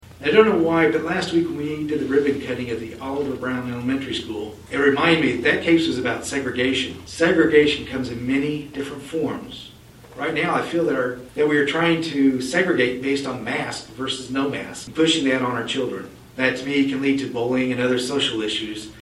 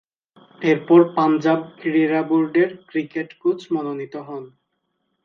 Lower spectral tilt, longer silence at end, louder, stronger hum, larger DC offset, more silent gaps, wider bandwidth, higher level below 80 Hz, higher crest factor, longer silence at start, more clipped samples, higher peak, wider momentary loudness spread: second, -4.5 dB/octave vs -8 dB/octave; second, 0.05 s vs 0.75 s; about the same, -21 LUFS vs -20 LUFS; neither; neither; neither; first, 13.5 kHz vs 6.4 kHz; first, -52 dBFS vs -74 dBFS; about the same, 22 dB vs 18 dB; second, 0.1 s vs 0.6 s; neither; about the same, 0 dBFS vs -2 dBFS; second, 12 LU vs 16 LU